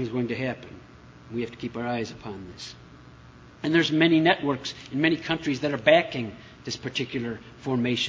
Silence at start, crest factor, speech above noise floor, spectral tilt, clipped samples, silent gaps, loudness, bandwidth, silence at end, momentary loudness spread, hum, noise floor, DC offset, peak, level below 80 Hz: 0 s; 22 dB; 23 dB; -5.5 dB/octave; under 0.1%; none; -26 LUFS; 7.8 kHz; 0 s; 19 LU; none; -49 dBFS; under 0.1%; -4 dBFS; -58 dBFS